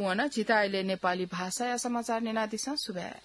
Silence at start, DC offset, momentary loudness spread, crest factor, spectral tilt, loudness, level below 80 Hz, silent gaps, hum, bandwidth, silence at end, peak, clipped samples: 0 s; under 0.1%; 6 LU; 16 dB; -3.5 dB/octave; -31 LUFS; -70 dBFS; none; none; 12 kHz; 0.05 s; -14 dBFS; under 0.1%